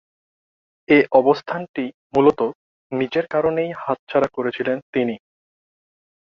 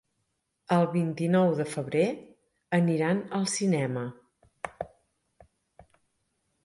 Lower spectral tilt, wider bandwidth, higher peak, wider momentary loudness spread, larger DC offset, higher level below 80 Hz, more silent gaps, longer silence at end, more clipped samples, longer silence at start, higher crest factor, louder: first, -7.5 dB/octave vs -6 dB/octave; second, 6.8 kHz vs 11.5 kHz; first, -2 dBFS vs -12 dBFS; second, 11 LU vs 17 LU; neither; first, -60 dBFS vs -68 dBFS; first, 1.69-1.74 s, 1.94-2.10 s, 2.55-2.90 s, 3.99-4.07 s, 4.82-4.93 s vs none; second, 1.2 s vs 1.75 s; neither; first, 0.9 s vs 0.7 s; about the same, 20 dB vs 18 dB; first, -20 LUFS vs -27 LUFS